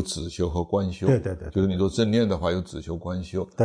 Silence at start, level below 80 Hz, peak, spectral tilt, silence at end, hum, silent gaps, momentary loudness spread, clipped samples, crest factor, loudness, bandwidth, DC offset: 0 s; -42 dBFS; -8 dBFS; -6.5 dB/octave; 0 s; none; none; 9 LU; under 0.1%; 16 dB; -26 LUFS; 10.5 kHz; under 0.1%